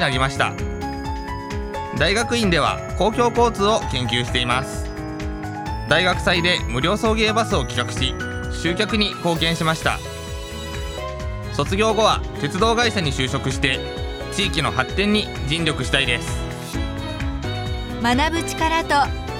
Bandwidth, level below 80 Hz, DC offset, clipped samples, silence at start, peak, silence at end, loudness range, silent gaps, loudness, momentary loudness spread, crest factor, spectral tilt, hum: 16.5 kHz; -32 dBFS; under 0.1%; under 0.1%; 0 s; -2 dBFS; 0 s; 3 LU; none; -21 LUFS; 11 LU; 20 dB; -4.5 dB/octave; none